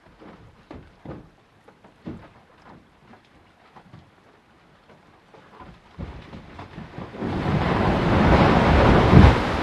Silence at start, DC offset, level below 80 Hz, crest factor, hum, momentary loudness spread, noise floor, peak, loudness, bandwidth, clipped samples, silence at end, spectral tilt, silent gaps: 0.7 s; under 0.1%; -30 dBFS; 22 dB; none; 28 LU; -55 dBFS; 0 dBFS; -18 LUFS; 10.5 kHz; under 0.1%; 0 s; -7.5 dB/octave; none